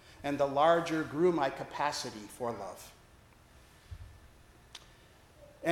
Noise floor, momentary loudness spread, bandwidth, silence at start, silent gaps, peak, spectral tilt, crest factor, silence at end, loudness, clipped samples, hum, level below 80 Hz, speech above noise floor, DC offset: -60 dBFS; 25 LU; 16.5 kHz; 0.1 s; none; -12 dBFS; -5 dB/octave; 22 dB; 0 s; -32 LUFS; under 0.1%; none; -62 dBFS; 28 dB; under 0.1%